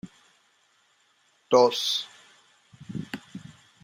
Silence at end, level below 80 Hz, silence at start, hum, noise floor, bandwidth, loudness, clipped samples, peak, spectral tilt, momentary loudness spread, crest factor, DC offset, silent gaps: 0.45 s; -72 dBFS; 0.05 s; none; -66 dBFS; 16 kHz; -24 LUFS; under 0.1%; -6 dBFS; -3.5 dB/octave; 24 LU; 24 dB; under 0.1%; none